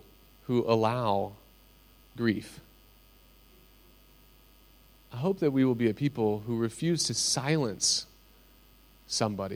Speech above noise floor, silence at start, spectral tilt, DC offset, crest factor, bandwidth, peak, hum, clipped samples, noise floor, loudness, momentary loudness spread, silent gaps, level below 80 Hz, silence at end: 30 dB; 0.5 s; -4.5 dB/octave; under 0.1%; 20 dB; 16.5 kHz; -12 dBFS; none; under 0.1%; -58 dBFS; -29 LUFS; 12 LU; none; -60 dBFS; 0 s